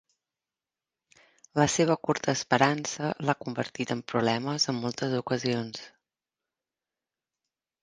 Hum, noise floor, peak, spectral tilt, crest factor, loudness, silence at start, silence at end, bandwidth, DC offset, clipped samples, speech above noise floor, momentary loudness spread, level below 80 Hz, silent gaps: none; under -90 dBFS; -6 dBFS; -4.5 dB/octave; 26 dB; -28 LUFS; 1.55 s; 1.95 s; 10.5 kHz; under 0.1%; under 0.1%; over 62 dB; 9 LU; -66 dBFS; none